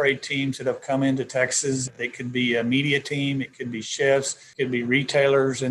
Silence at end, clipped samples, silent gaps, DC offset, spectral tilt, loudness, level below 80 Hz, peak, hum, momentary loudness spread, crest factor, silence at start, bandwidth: 0 s; under 0.1%; none; under 0.1%; -4 dB/octave; -23 LUFS; -66 dBFS; -6 dBFS; none; 9 LU; 18 dB; 0 s; 12 kHz